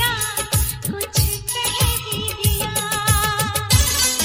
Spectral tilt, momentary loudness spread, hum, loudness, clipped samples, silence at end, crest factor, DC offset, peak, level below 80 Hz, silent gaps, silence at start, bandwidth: -2.5 dB/octave; 5 LU; none; -19 LUFS; under 0.1%; 0 s; 18 dB; under 0.1%; -2 dBFS; -30 dBFS; none; 0 s; 16.5 kHz